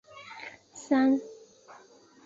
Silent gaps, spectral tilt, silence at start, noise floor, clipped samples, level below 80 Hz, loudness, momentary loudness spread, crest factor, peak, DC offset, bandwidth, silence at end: none; -4 dB/octave; 0.15 s; -56 dBFS; under 0.1%; -74 dBFS; -26 LUFS; 22 LU; 18 dB; -14 dBFS; under 0.1%; 7.8 kHz; 0.9 s